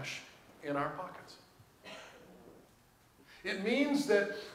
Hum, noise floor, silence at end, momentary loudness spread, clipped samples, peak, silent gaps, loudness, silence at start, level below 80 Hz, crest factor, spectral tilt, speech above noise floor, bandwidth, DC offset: none; -65 dBFS; 0 s; 25 LU; under 0.1%; -16 dBFS; none; -35 LUFS; 0 s; -74 dBFS; 22 dB; -4.5 dB/octave; 31 dB; 16 kHz; under 0.1%